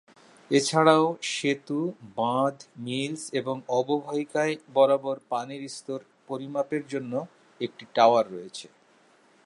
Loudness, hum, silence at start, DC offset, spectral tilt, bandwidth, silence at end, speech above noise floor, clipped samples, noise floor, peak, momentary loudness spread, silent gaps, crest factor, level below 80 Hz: -26 LUFS; none; 0.5 s; under 0.1%; -4.5 dB/octave; 11.5 kHz; 0.85 s; 34 dB; under 0.1%; -60 dBFS; -6 dBFS; 16 LU; none; 22 dB; -80 dBFS